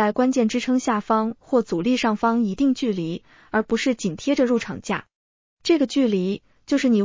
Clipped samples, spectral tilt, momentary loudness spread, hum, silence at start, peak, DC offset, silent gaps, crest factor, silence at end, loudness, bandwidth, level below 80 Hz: under 0.1%; -5.5 dB/octave; 8 LU; none; 0 s; -8 dBFS; under 0.1%; 5.15-5.57 s; 14 dB; 0 s; -22 LUFS; 7.6 kHz; -56 dBFS